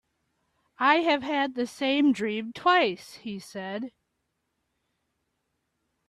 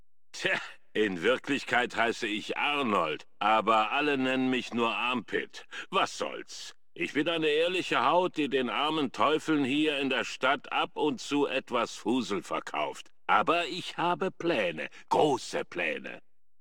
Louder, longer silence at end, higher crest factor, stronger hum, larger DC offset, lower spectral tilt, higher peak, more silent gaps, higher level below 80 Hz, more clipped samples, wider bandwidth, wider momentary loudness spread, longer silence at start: first, -25 LUFS vs -29 LUFS; first, 2.2 s vs 0.4 s; about the same, 22 dB vs 20 dB; neither; second, under 0.1% vs 0.3%; about the same, -4.5 dB/octave vs -4 dB/octave; first, -6 dBFS vs -10 dBFS; neither; about the same, -74 dBFS vs -72 dBFS; neither; second, 13 kHz vs 17 kHz; first, 16 LU vs 10 LU; first, 0.8 s vs 0.35 s